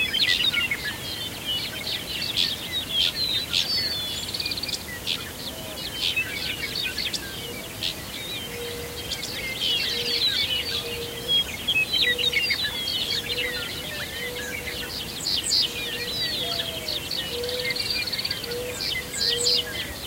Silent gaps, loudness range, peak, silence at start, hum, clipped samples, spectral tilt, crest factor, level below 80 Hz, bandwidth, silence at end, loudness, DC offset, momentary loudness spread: none; 5 LU; -8 dBFS; 0 s; none; under 0.1%; -1.5 dB/octave; 20 dB; -48 dBFS; 16 kHz; 0 s; -25 LUFS; under 0.1%; 10 LU